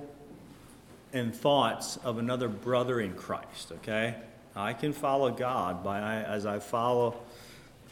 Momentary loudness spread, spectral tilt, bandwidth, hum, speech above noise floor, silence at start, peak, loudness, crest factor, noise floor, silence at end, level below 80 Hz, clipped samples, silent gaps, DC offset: 20 LU; -5 dB/octave; 19 kHz; none; 22 dB; 0 s; -12 dBFS; -31 LUFS; 20 dB; -53 dBFS; 0 s; -64 dBFS; under 0.1%; none; under 0.1%